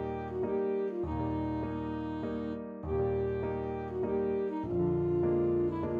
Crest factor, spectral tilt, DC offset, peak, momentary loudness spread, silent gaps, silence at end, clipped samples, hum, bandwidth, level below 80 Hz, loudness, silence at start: 12 dB; -10.5 dB/octave; under 0.1%; -20 dBFS; 7 LU; none; 0 s; under 0.1%; none; 4.6 kHz; -50 dBFS; -33 LUFS; 0 s